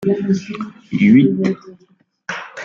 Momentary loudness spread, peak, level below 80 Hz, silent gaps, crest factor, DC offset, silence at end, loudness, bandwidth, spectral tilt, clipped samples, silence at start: 18 LU; -2 dBFS; -58 dBFS; none; 16 dB; under 0.1%; 0 s; -16 LUFS; 7.2 kHz; -7.5 dB/octave; under 0.1%; 0 s